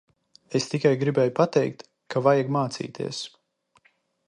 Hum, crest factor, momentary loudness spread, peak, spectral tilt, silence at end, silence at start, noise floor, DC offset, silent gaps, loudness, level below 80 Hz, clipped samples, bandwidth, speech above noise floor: none; 20 dB; 11 LU; -6 dBFS; -6 dB/octave; 1 s; 0.5 s; -65 dBFS; under 0.1%; none; -25 LUFS; -70 dBFS; under 0.1%; 11 kHz; 42 dB